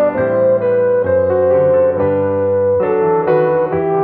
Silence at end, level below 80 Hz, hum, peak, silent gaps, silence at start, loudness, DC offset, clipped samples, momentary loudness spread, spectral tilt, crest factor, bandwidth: 0 s; -50 dBFS; none; -2 dBFS; none; 0 s; -14 LUFS; under 0.1%; under 0.1%; 3 LU; -8 dB/octave; 12 dB; 3.6 kHz